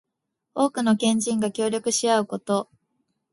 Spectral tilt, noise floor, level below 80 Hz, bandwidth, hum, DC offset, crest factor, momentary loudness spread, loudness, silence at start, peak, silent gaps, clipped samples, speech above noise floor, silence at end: -4 dB/octave; -81 dBFS; -68 dBFS; 11.5 kHz; none; under 0.1%; 18 dB; 6 LU; -23 LUFS; 0.55 s; -8 dBFS; none; under 0.1%; 58 dB; 0.7 s